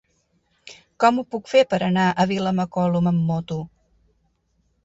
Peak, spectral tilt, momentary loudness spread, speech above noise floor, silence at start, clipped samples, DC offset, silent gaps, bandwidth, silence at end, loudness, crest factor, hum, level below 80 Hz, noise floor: -4 dBFS; -7 dB/octave; 8 LU; 47 dB; 0.65 s; under 0.1%; under 0.1%; none; 8 kHz; 1.15 s; -21 LUFS; 18 dB; none; -58 dBFS; -67 dBFS